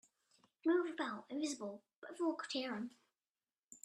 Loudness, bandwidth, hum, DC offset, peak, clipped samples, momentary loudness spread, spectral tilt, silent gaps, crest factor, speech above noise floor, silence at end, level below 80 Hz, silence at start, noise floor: -41 LUFS; 12 kHz; none; under 0.1%; -26 dBFS; under 0.1%; 14 LU; -3.5 dB/octave; 1.96-2.02 s, 3.29-3.34 s, 3.64-3.68 s; 18 dB; over 50 dB; 0.1 s; under -90 dBFS; 0.65 s; under -90 dBFS